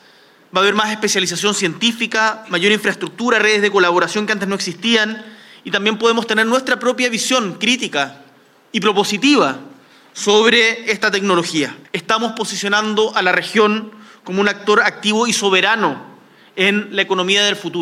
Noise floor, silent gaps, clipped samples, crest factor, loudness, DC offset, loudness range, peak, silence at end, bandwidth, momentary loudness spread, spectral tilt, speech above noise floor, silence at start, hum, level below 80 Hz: -49 dBFS; none; under 0.1%; 16 dB; -16 LUFS; under 0.1%; 2 LU; 0 dBFS; 0 s; 15.5 kHz; 8 LU; -3 dB/octave; 33 dB; 0.55 s; none; -66 dBFS